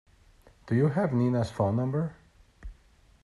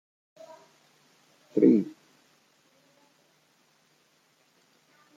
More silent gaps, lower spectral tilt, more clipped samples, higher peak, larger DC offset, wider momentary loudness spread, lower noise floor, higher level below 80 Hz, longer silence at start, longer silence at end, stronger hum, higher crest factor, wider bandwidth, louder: neither; about the same, -9 dB/octave vs -9 dB/octave; neither; second, -14 dBFS vs -8 dBFS; neither; second, 6 LU vs 29 LU; second, -60 dBFS vs -67 dBFS; first, -54 dBFS vs -80 dBFS; second, 0.65 s vs 1.55 s; second, 0.5 s vs 3.25 s; neither; second, 16 dB vs 24 dB; first, 11 kHz vs 7.6 kHz; second, -28 LUFS vs -24 LUFS